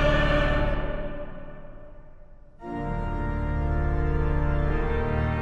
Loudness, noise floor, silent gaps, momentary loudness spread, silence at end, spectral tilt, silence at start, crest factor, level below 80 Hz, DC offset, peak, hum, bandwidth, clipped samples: -27 LUFS; -46 dBFS; none; 19 LU; 0 s; -8 dB/octave; 0 s; 16 dB; -28 dBFS; under 0.1%; -8 dBFS; none; 6.8 kHz; under 0.1%